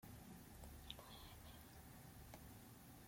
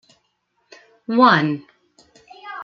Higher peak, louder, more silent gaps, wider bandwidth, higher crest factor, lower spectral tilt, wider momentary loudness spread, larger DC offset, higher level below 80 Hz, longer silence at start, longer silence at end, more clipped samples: second, -34 dBFS vs -2 dBFS; second, -59 LUFS vs -17 LUFS; neither; first, 16.5 kHz vs 7.2 kHz; first, 26 dB vs 20 dB; second, -4 dB/octave vs -6.5 dB/octave; second, 4 LU vs 24 LU; neither; about the same, -66 dBFS vs -68 dBFS; second, 0 s vs 1.1 s; about the same, 0 s vs 0 s; neither